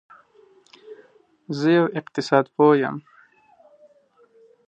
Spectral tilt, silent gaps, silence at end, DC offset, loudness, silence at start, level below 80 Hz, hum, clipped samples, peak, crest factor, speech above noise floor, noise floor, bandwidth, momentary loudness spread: -7 dB/octave; none; 1.65 s; under 0.1%; -20 LUFS; 0.9 s; -74 dBFS; none; under 0.1%; -2 dBFS; 22 dB; 38 dB; -58 dBFS; 8.6 kHz; 12 LU